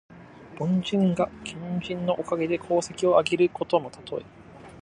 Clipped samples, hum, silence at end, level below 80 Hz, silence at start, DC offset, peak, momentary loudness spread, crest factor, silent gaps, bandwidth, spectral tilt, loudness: under 0.1%; none; 0 s; -60 dBFS; 0.1 s; under 0.1%; -6 dBFS; 14 LU; 20 dB; none; 10.5 kHz; -6 dB/octave; -26 LUFS